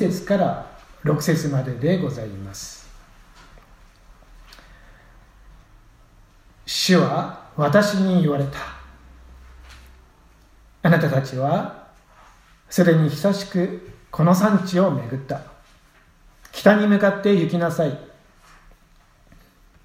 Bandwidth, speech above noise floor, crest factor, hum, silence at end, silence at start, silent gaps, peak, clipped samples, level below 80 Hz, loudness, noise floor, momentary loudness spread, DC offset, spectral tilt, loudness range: 16 kHz; 35 dB; 22 dB; none; 1.8 s; 0 s; none; 0 dBFS; under 0.1%; -50 dBFS; -20 LUFS; -54 dBFS; 17 LU; under 0.1%; -6 dB/octave; 6 LU